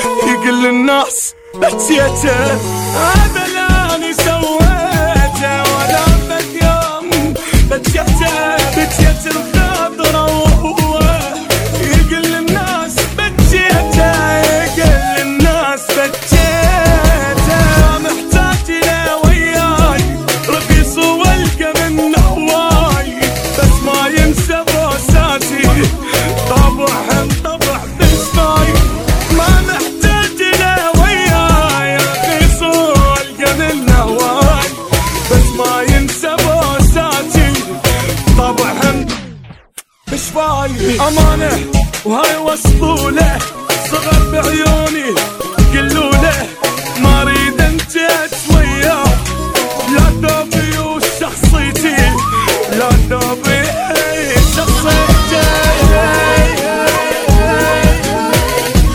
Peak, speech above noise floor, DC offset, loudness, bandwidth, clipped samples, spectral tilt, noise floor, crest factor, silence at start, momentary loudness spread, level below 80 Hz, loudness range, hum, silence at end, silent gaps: 0 dBFS; 25 dB; under 0.1%; -12 LUFS; 18 kHz; 0.2%; -4.5 dB/octave; -36 dBFS; 10 dB; 0 s; 5 LU; -16 dBFS; 2 LU; none; 0 s; none